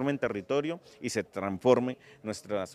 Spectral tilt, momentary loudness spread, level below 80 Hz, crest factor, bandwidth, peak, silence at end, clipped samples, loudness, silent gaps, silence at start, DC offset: -5.5 dB/octave; 13 LU; -68 dBFS; 22 dB; 14 kHz; -8 dBFS; 0 s; under 0.1%; -31 LUFS; none; 0 s; under 0.1%